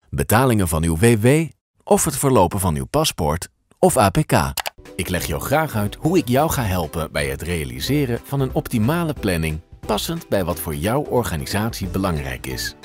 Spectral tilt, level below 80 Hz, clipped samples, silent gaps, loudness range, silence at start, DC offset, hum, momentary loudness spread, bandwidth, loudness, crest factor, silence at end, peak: -5 dB/octave; -36 dBFS; under 0.1%; 1.61-1.74 s; 4 LU; 0.1 s; under 0.1%; none; 9 LU; 16.5 kHz; -20 LUFS; 16 dB; 0.1 s; -4 dBFS